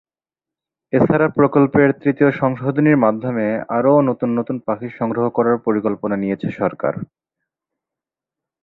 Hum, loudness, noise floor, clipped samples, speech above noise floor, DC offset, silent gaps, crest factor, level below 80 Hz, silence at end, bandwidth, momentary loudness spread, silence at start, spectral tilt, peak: none; -18 LUFS; -89 dBFS; under 0.1%; 73 dB; under 0.1%; none; 16 dB; -56 dBFS; 1.6 s; 4.1 kHz; 9 LU; 0.95 s; -11.5 dB/octave; -2 dBFS